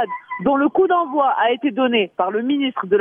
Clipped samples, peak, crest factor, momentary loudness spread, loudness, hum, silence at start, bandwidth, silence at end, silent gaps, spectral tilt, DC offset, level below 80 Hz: under 0.1%; -6 dBFS; 12 dB; 4 LU; -18 LUFS; none; 0 s; 3.7 kHz; 0 s; none; -8.5 dB/octave; under 0.1%; -60 dBFS